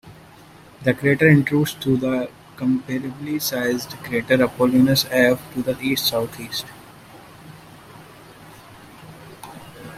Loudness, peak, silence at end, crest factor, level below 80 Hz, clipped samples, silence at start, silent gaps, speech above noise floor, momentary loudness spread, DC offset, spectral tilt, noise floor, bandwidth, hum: -20 LUFS; -2 dBFS; 0 s; 20 dB; -54 dBFS; under 0.1%; 0.05 s; none; 26 dB; 22 LU; under 0.1%; -5 dB/octave; -46 dBFS; 16 kHz; none